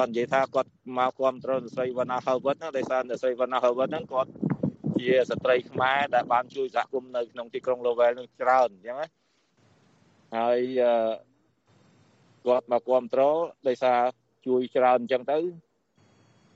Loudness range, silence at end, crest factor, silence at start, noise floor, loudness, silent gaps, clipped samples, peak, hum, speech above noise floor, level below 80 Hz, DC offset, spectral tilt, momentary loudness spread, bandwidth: 3 LU; 0.95 s; 18 dB; 0 s; -65 dBFS; -26 LUFS; none; under 0.1%; -10 dBFS; none; 40 dB; -72 dBFS; under 0.1%; -6.5 dB/octave; 9 LU; 7.8 kHz